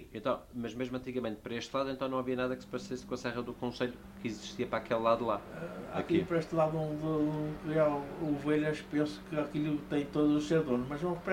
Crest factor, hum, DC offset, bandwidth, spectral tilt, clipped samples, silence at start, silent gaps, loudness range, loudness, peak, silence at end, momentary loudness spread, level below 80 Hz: 18 dB; none; under 0.1%; 16 kHz; -6.5 dB/octave; under 0.1%; 0 s; none; 5 LU; -34 LUFS; -14 dBFS; 0 s; 10 LU; -58 dBFS